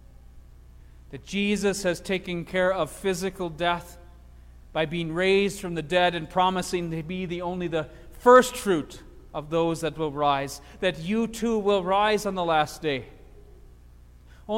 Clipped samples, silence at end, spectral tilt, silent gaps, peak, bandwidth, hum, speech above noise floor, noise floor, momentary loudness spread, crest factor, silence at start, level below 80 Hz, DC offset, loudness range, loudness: under 0.1%; 0 s; -5 dB/octave; none; -4 dBFS; 16.5 kHz; none; 25 dB; -50 dBFS; 10 LU; 22 dB; 0.35 s; -48 dBFS; under 0.1%; 5 LU; -25 LUFS